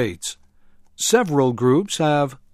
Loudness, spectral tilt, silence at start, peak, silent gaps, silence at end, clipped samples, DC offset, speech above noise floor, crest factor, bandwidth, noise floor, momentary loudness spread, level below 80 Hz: -19 LUFS; -4.5 dB/octave; 0 s; -2 dBFS; none; 0.2 s; under 0.1%; under 0.1%; 31 dB; 18 dB; 15.5 kHz; -50 dBFS; 9 LU; -56 dBFS